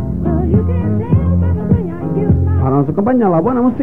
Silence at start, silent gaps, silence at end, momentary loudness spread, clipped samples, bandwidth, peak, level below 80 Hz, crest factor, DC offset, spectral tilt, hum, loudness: 0 s; none; 0 s; 4 LU; under 0.1%; 3 kHz; 0 dBFS; -26 dBFS; 12 dB; 2%; -12.5 dB/octave; none; -14 LUFS